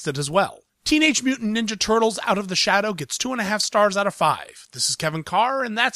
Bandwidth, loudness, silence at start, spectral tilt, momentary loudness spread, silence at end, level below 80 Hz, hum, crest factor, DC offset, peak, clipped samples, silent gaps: 15.5 kHz; -21 LUFS; 0 s; -3 dB/octave; 7 LU; 0.05 s; -54 dBFS; none; 18 dB; under 0.1%; -4 dBFS; under 0.1%; none